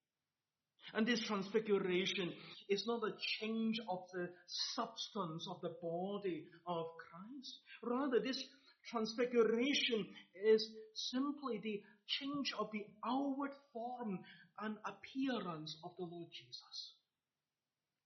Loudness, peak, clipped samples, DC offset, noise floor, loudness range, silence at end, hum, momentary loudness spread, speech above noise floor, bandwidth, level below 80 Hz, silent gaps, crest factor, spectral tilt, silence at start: -41 LUFS; -22 dBFS; under 0.1%; under 0.1%; under -90 dBFS; 8 LU; 1.15 s; none; 15 LU; over 49 dB; 6.4 kHz; -88 dBFS; none; 20 dB; -3 dB/octave; 0.85 s